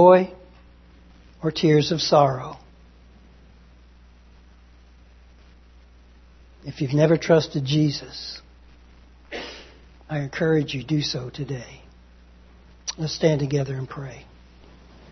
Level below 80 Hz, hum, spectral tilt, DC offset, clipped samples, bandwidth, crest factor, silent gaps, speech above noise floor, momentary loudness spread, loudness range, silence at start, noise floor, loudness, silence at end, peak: -50 dBFS; 60 Hz at -50 dBFS; -6 dB/octave; under 0.1%; under 0.1%; 6.4 kHz; 22 dB; none; 29 dB; 19 LU; 4 LU; 0 s; -50 dBFS; -23 LUFS; 0.9 s; -2 dBFS